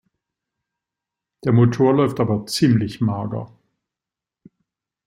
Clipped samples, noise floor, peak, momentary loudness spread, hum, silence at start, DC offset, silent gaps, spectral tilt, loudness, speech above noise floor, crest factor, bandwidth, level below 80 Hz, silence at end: under 0.1%; -88 dBFS; -4 dBFS; 13 LU; none; 1.45 s; under 0.1%; none; -7 dB/octave; -19 LUFS; 70 dB; 18 dB; 15.5 kHz; -56 dBFS; 1.6 s